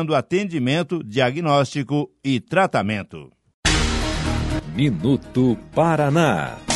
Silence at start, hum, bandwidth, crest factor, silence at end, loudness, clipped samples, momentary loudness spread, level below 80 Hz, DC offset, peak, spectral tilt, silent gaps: 0 s; none; 11.5 kHz; 18 dB; 0 s; -21 LUFS; under 0.1%; 6 LU; -34 dBFS; under 0.1%; -4 dBFS; -5.5 dB/octave; 3.54-3.63 s